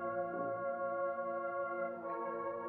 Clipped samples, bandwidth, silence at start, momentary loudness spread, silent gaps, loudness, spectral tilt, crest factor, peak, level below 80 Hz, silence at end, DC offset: under 0.1%; 3 kHz; 0 s; 3 LU; none; -39 LUFS; -7 dB/octave; 12 dB; -28 dBFS; -82 dBFS; 0 s; under 0.1%